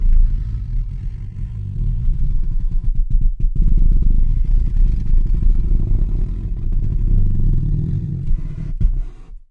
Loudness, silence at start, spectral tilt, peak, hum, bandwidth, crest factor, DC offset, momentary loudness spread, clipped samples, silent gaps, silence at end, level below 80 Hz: -22 LUFS; 0 s; -10.5 dB/octave; -4 dBFS; none; 1.1 kHz; 10 dB; under 0.1%; 8 LU; under 0.1%; none; 0.15 s; -16 dBFS